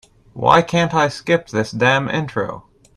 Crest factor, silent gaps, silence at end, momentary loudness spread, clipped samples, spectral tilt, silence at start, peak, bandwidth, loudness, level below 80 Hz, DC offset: 18 dB; none; 0.35 s; 10 LU; under 0.1%; -5.5 dB/octave; 0.35 s; 0 dBFS; 12 kHz; -17 LUFS; -50 dBFS; under 0.1%